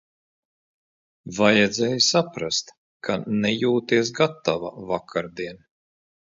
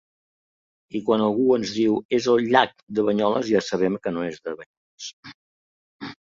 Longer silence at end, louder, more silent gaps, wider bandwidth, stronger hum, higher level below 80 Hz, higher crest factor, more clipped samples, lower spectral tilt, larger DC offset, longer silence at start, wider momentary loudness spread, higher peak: first, 0.85 s vs 0.1 s; about the same, -22 LUFS vs -22 LUFS; second, 2.78-3.00 s vs 2.05-2.09 s, 2.83-2.87 s, 4.66-4.98 s, 5.13-5.23 s, 5.34-5.99 s; about the same, 7.8 kHz vs 7.6 kHz; neither; about the same, -62 dBFS vs -64 dBFS; about the same, 20 dB vs 20 dB; neither; second, -4 dB/octave vs -5.5 dB/octave; neither; first, 1.25 s vs 0.95 s; second, 14 LU vs 18 LU; about the same, -4 dBFS vs -4 dBFS